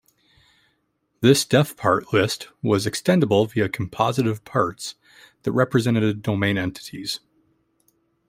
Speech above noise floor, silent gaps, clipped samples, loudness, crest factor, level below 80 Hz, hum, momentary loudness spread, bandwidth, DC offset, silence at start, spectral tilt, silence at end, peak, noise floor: 50 dB; none; under 0.1%; -22 LUFS; 20 dB; -58 dBFS; none; 12 LU; 16 kHz; under 0.1%; 1.2 s; -5.5 dB/octave; 1.1 s; -2 dBFS; -71 dBFS